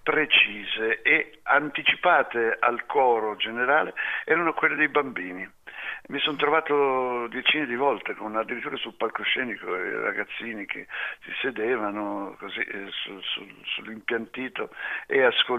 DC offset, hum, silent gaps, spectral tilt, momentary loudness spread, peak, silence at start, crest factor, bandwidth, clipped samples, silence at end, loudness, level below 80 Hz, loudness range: under 0.1%; none; none; -5 dB/octave; 12 LU; -8 dBFS; 0.05 s; 18 dB; 5.4 kHz; under 0.1%; 0 s; -25 LUFS; -68 dBFS; 8 LU